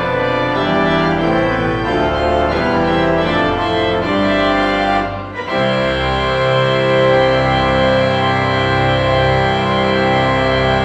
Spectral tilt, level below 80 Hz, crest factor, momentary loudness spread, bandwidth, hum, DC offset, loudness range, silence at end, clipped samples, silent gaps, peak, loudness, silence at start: -6.5 dB/octave; -32 dBFS; 14 dB; 3 LU; 9.2 kHz; none; under 0.1%; 2 LU; 0 s; under 0.1%; none; -2 dBFS; -15 LUFS; 0 s